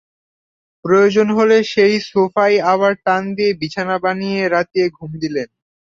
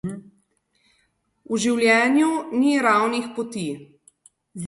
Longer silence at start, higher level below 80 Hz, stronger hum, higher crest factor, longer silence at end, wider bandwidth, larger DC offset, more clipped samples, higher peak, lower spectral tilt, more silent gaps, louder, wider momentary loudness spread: first, 0.85 s vs 0.05 s; first, -58 dBFS vs -64 dBFS; neither; about the same, 14 dB vs 18 dB; first, 0.4 s vs 0 s; second, 7.6 kHz vs 11.5 kHz; neither; neither; about the same, -2 dBFS vs -4 dBFS; about the same, -5.5 dB/octave vs -4.5 dB/octave; neither; first, -16 LUFS vs -20 LUFS; second, 10 LU vs 18 LU